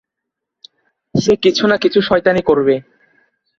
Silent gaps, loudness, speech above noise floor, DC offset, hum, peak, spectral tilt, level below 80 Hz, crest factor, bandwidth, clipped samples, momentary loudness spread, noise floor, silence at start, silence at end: none; -14 LUFS; 67 dB; under 0.1%; none; 0 dBFS; -5.5 dB/octave; -50 dBFS; 16 dB; 7.4 kHz; under 0.1%; 5 LU; -80 dBFS; 1.15 s; 0.8 s